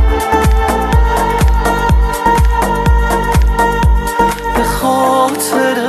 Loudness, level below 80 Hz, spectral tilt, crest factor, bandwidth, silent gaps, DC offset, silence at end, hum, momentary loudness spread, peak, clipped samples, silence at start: -12 LUFS; -14 dBFS; -5.5 dB/octave; 10 dB; 14 kHz; none; under 0.1%; 0 s; none; 2 LU; 0 dBFS; under 0.1%; 0 s